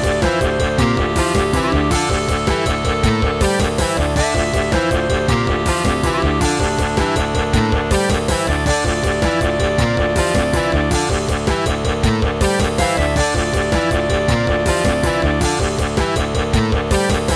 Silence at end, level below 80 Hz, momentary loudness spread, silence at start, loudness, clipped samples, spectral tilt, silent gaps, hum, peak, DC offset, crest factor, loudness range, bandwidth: 0 s; -24 dBFS; 2 LU; 0 s; -17 LUFS; under 0.1%; -5 dB/octave; none; none; -2 dBFS; 0.2%; 14 dB; 0 LU; 11 kHz